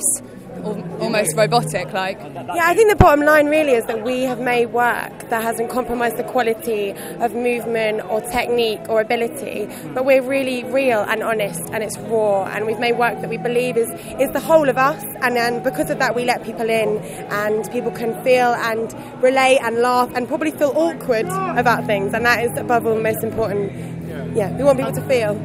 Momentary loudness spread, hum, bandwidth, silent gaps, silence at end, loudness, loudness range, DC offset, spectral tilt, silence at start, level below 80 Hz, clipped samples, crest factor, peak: 9 LU; none; 16 kHz; none; 0 s; -19 LUFS; 4 LU; under 0.1%; -4.5 dB/octave; 0 s; -42 dBFS; under 0.1%; 18 dB; 0 dBFS